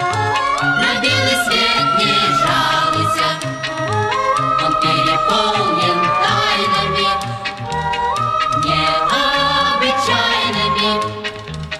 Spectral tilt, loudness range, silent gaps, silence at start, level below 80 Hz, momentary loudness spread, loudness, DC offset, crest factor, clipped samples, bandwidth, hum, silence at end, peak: -3.5 dB/octave; 2 LU; none; 0 s; -42 dBFS; 7 LU; -15 LUFS; under 0.1%; 14 dB; under 0.1%; 14.5 kHz; none; 0 s; -2 dBFS